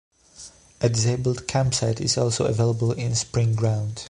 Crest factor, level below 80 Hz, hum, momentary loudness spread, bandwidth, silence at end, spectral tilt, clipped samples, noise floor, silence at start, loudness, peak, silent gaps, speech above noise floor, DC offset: 16 dB; -48 dBFS; none; 12 LU; 11 kHz; 0 s; -5 dB/octave; under 0.1%; -47 dBFS; 0.4 s; -23 LUFS; -6 dBFS; none; 24 dB; under 0.1%